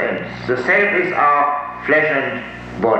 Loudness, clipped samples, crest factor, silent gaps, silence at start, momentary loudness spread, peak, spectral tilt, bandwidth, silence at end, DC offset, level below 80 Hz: -16 LUFS; under 0.1%; 14 dB; none; 0 s; 10 LU; -2 dBFS; -6.5 dB/octave; 8.4 kHz; 0 s; under 0.1%; -48 dBFS